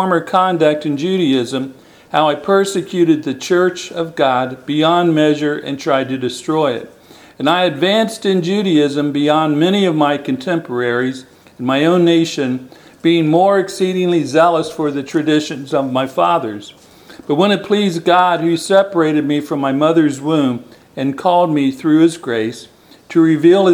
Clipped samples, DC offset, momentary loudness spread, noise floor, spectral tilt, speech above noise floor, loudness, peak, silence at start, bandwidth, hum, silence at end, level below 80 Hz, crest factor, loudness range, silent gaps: under 0.1%; under 0.1%; 8 LU; -40 dBFS; -5.5 dB/octave; 25 dB; -15 LUFS; 0 dBFS; 0 s; 15 kHz; none; 0 s; -62 dBFS; 14 dB; 2 LU; none